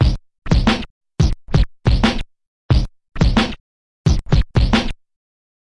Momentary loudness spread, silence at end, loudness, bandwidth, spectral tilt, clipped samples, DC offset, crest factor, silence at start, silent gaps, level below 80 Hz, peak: 13 LU; 0.7 s; -19 LUFS; 10.5 kHz; -6.5 dB/octave; under 0.1%; under 0.1%; 16 dB; 0 s; 0.90-1.01 s, 2.47-2.69 s, 3.60-4.04 s; -22 dBFS; -2 dBFS